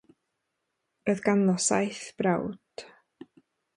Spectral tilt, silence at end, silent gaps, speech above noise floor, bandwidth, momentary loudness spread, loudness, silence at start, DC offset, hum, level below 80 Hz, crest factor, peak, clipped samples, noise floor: -4.5 dB/octave; 0.9 s; none; 55 dB; 11.5 kHz; 20 LU; -27 LUFS; 1.05 s; under 0.1%; none; -68 dBFS; 20 dB; -10 dBFS; under 0.1%; -81 dBFS